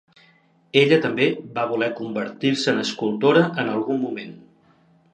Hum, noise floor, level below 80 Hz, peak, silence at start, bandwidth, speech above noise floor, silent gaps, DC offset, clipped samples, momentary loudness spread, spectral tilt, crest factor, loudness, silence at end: none; -58 dBFS; -72 dBFS; -2 dBFS; 0.75 s; 9.2 kHz; 37 dB; none; under 0.1%; under 0.1%; 11 LU; -5.5 dB/octave; 22 dB; -21 LUFS; 0.75 s